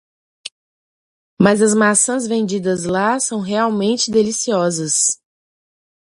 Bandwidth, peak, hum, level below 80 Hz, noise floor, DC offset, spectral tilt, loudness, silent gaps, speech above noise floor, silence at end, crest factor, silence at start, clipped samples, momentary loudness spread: 11.5 kHz; 0 dBFS; none; -58 dBFS; under -90 dBFS; under 0.1%; -3.5 dB/octave; -16 LUFS; 0.52-1.37 s; over 74 dB; 0.95 s; 18 dB; 0.45 s; under 0.1%; 11 LU